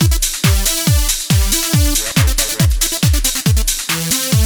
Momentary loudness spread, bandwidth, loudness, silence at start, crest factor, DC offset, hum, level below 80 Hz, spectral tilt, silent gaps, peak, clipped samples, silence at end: 2 LU; over 20 kHz; -14 LUFS; 0 s; 14 dB; under 0.1%; none; -18 dBFS; -3 dB/octave; none; 0 dBFS; under 0.1%; 0 s